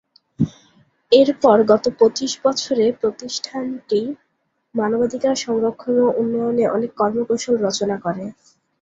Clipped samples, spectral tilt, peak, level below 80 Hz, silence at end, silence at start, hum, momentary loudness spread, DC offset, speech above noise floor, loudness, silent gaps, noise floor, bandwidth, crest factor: under 0.1%; -5 dB/octave; -2 dBFS; -58 dBFS; 0.5 s; 0.4 s; none; 12 LU; under 0.1%; 52 dB; -19 LUFS; none; -70 dBFS; 7.8 kHz; 18 dB